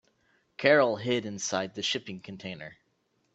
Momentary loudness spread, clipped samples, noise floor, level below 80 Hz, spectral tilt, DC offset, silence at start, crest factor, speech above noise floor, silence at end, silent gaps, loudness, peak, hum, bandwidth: 20 LU; under 0.1%; -74 dBFS; -72 dBFS; -3.5 dB/octave; under 0.1%; 0.6 s; 22 dB; 45 dB; 0.6 s; none; -27 LUFS; -8 dBFS; none; 8.4 kHz